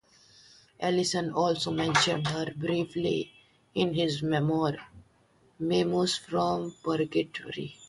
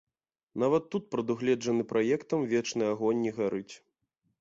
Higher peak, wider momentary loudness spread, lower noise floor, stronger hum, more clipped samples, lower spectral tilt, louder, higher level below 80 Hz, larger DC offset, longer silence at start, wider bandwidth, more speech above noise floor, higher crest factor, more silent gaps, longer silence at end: first, -10 dBFS vs -14 dBFS; first, 9 LU vs 5 LU; second, -64 dBFS vs -79 dBFS; neither; neither; about the same, -5 dB/octave vs -5.5 dB/octave; about the same, -29 LUFS vs -30 LUFS; first, -62 dBFS vs -72 dBFS; neither; first, 0.8 s vs 0.55 s; first, 11.5 kHz vs 7.8 kHz; second, 36 dB vs 49 dB; about the same, 20 dB vs 16 dB; neither; second, 0 s vs 0.65 s